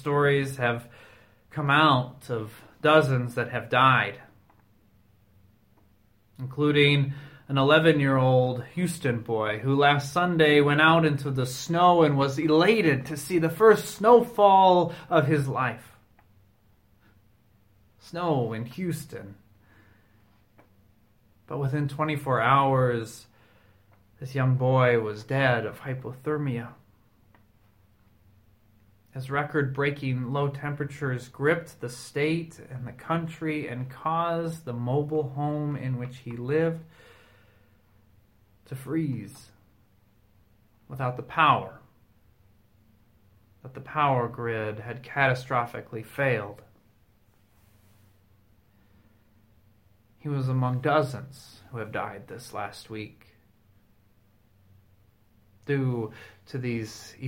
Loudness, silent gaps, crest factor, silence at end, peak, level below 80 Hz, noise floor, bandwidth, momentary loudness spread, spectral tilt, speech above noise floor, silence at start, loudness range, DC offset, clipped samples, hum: -25 LUFS; none; 22 dB; 0 s; -6 dBFS; -62 dBFS; -63 dBFS; 16.5 kHz; 19 LU; -6.5 dB/octave; 38 dB; 0 s; 15 LU; under 0.1%; under 0.1%; none